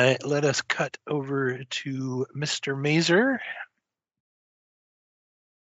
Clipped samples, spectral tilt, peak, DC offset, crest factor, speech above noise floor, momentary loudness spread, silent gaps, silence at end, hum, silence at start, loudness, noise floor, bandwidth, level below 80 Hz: under 0.1%; -4 dB/octave; -6 dBFS; under 0.1%; 22 dB; 57 dB; 10 LU; none; 2.05 s; none; 0 s; -26 LUFS; -83 dBFS; 8 kHz; -72 dBFS